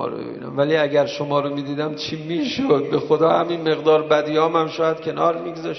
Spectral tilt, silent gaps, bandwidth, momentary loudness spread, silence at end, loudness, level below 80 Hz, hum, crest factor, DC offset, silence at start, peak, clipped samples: -6 dB/octave; none; 6.2 kHz; 8 LU; 0 s; -20 LUFS; -64 dBFS; none; 16 dB; under 0.1%; 0 s; -4 dBFS; under 0.1%